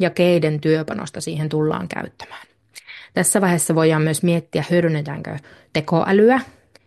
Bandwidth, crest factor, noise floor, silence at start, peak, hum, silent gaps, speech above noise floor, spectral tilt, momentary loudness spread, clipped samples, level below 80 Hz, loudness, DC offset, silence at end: 12.5 kHz; 16 dB; -42 dBFS; 0 s; -4 dBFS; none; none; 23 dB; -5.5 dB/octave; 17 LU; under 0.1%; -60 dBFS; -19 LUFS; under 0.1%; 0.4 s